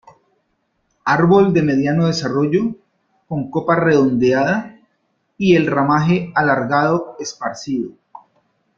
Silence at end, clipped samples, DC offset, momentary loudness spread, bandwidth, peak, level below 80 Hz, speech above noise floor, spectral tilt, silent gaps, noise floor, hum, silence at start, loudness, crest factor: 0.6 s; under 0.1%; under 0.1%; 13 LU; 7.4 kHz; -2 dBFS; -54 dBFS; 52 dB; -6.5 dB/octave; none; -67 dBFS; none; 1.05 s; -17 LUFS; 16 dB